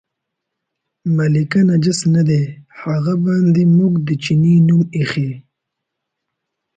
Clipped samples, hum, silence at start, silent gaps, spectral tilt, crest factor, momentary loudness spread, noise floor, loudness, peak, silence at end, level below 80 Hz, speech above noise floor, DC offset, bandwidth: under 0.1%; none; 1.05 s; none; -7 dB/octave; 12 dB; 11 LU; -78 dBFS; -15 LUFS; -4 dBFS; 1.35 s; -54 dBFS; 64 dB; under 0.1%; 9.2 kHz